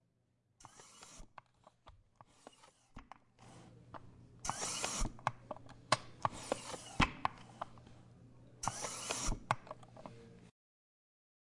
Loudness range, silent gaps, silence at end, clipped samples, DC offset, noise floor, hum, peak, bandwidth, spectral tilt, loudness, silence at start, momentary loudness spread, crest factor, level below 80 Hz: 20 LU; none; 1 s; under 0.1%; under 0.1%; -78 dBFS; none; -16 dBFS; 11.5 kHz; -3 dB/octave; -40 LUFS; 0.6 s; 24 LU; 28 dB; -52 dBFS